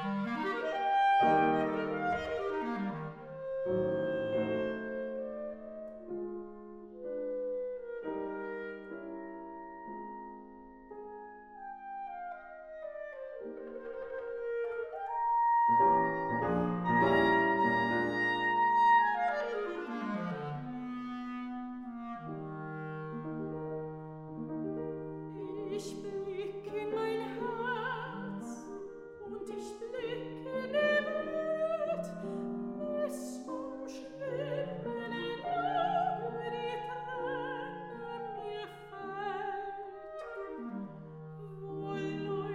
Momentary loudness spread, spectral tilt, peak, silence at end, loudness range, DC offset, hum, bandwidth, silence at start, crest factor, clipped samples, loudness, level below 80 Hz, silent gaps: 18 LU; -6.5 dB/octave; -16 dBFS; 0 s; 14 LU; under 0.1%; none; 13 kHz; 0 s; 18 dB; under 0.1%; -34 LUFS; -68 dBFS; none